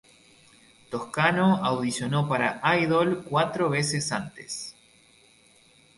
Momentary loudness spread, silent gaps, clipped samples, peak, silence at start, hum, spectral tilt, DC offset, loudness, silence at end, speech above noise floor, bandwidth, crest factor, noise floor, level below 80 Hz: 13 LU; none; under 0.1%; -8 dBFS; 0.9 s; none; -5 dB/octave; under 0.1%; -25 LUFS; 1.25 s; 33 dB; 11.5 kHz; 20 dB; -58 dBFS; -62 dBFS